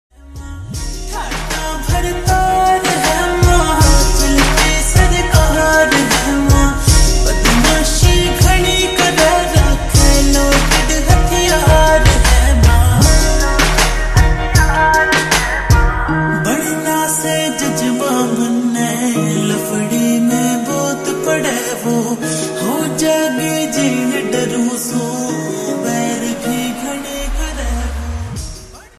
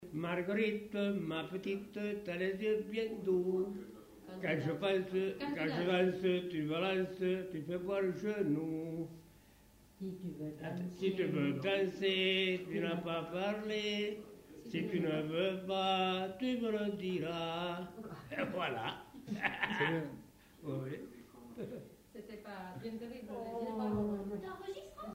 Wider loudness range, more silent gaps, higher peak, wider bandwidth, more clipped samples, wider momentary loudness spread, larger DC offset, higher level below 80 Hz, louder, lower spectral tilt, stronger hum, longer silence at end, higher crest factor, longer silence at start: about the same, 6 LU vs 7 LU; neither; first, 0 dBFS vs -18 dBFS; second, 14 kHz vs 16 kHz; neither; second, 10 LU vs 14 LU; neither; first, -18 dBFS vs -68 dBFS; first, -13 LUFS vs -37 LUFS; second, -4 dB/octave vs -6.5 dB/octave; neither; first, 0.15 s vs 0 s; second, 12 dB vs 20 dB; first, 0.25 s vs 0 s